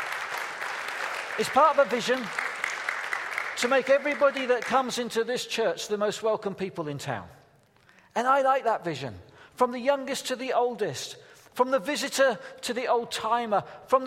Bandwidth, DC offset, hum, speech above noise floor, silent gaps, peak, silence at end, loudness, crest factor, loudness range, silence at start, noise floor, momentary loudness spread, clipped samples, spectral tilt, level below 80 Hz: 16 kHz; under 0.1%; none; 33 dB; none; -8 dBFS; 0 s; -27 LUFS; 20 dB; 4 LU; 0 s; -60 dBFS; 11 LU; under 0.1%; -3 dB/octave; -72 dBFS